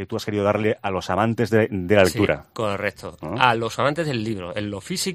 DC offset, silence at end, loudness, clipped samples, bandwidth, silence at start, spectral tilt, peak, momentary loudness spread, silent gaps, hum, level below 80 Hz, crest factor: under 0.1%; 0 s; -22 LUFS; under 0.1%; 15.5 kHz; 0 s; -5 dB/octave; 0 dBFS; 10 LU; none; none; -52 dBFS; 22 dB